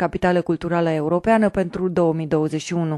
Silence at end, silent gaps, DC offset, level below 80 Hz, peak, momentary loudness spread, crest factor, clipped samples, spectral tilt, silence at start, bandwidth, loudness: 0 s; none; under 0.1%; -46 dBFS; -4 dBFS; 5 LU; 16 dB; under 0.1%; -7 dB/octave; 0 s; 11 kHz; -20 LUFS